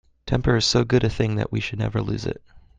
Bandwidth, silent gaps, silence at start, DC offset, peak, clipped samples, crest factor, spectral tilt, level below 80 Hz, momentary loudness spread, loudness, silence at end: 9.2 kHz; none; 0.25 s; under 0.1%; -4 dBFS; under 0.1%; 18 dB; -5.5 dB/octave; -38 dBFS; 10 LU; -23 LUFS; 0.2 s